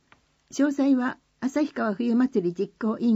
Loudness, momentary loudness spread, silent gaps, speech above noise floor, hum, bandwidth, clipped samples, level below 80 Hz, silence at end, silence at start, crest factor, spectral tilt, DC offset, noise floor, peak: -25 LUFS; 7 LU; none; 38 dB; none; 8 kHz; under 0.1%; -70 dBFS; 0 s; 0.55 s; 14 dB; -6.5 dB/octave; under 0.1%; -62 dBFS; -12 dBFS